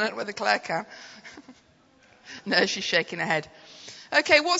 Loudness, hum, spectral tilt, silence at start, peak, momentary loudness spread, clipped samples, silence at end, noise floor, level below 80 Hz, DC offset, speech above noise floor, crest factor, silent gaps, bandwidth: -24 LUFS; none; -2.5 dB/octave; 0 s; -4 dBFS; 22 LU; under 0.1%; 0 s; -59 dBFS; -68 dBFS; under 0.1%; 34 dB; 24 dB; none; 8 kHz